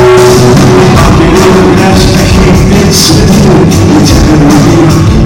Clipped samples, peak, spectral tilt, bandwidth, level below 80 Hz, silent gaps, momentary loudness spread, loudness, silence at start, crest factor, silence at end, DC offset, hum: 6%; 0 dBFS; -5.5 dB/octave; 19 kHz; -14 dBFS; none; 2 LU; -3 LUFS; 0 s; 2 dB; 0 s; under 0.1%; none